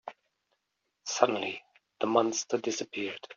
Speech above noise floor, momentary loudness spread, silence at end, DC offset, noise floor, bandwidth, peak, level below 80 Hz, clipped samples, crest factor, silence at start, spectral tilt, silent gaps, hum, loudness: 51 dB; 14 LU; 0.05 s; under 0.1%; -81 dBFS; 7.4 kHz; -6 dBFS; -80 dBFS; under 0.1%; 26 dB; 0.05 s; -2.5 dB/octave; none; none; -30 LUFS